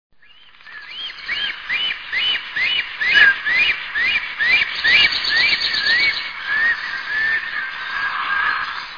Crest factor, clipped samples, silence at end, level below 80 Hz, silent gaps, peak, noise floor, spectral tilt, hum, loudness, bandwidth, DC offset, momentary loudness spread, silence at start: 18 dB; under 0.1%; 0 s; -52 dBFS; none; 0 dBFS; -49 dBFS; -0.5 dB/octave; none; -16 LUFS; 5.4 kHz; 0.3%; 12 LU; 0.65 s